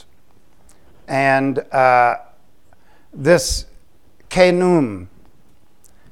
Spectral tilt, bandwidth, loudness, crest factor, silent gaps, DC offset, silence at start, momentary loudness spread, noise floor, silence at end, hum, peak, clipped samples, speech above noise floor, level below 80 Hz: -5 dB/octave; 16.5 kHz; -16 LUFS; 20 dB; none; 0.8%; 1.1 s; 11 LU; -56 dBFS; 1.05 s; none; 0 dBFS; under 0.1%; 41 dB; -40 dBFS